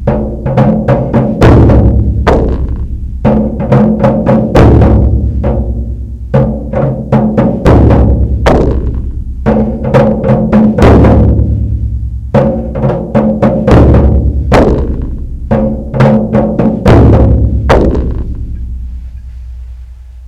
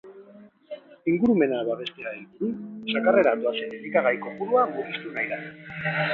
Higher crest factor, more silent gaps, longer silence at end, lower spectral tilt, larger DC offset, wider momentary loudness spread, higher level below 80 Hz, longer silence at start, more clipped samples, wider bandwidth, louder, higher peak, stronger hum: second, 8 dB vs 18 dB; neither; about the same, 0 s vs 0 s; about the same, -9 dB/octave vs -8 dB/octave; neither; about the same, 15 LU vs 15 LU; first, -14 dBFS vs -68 dBFS; about the same, 0 s vs 0.05 s; first, 3% vs under 0.1%; first, 7.8 kHz vs 4.8 kHz; first, -9 LUFS vs -25 LUFS; first, 0 dBFS vs -6 dBFS; neither